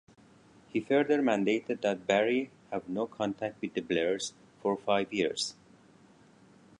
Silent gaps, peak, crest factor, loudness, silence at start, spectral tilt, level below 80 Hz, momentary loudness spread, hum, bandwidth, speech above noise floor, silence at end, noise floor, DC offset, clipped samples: none; -12 dBFS; 20 dB; -31 LUFS; 0.75 s; -4.5 dB/octave; -72 dBFS; 9 LU; none; 11 kHz; 29 dB; 1.3 s; -59 dBFS; under 0.1%; under 0.1%